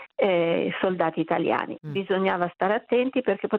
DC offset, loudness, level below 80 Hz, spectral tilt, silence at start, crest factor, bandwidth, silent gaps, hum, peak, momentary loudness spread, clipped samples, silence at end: under 0.1%; -25 LUFS; -68 dBFS; -9 dB/octave; 0 s; 16 dB; 4.9 kHz; none; none; -8 dBFS; 4 LU; under 0.1%; 0 s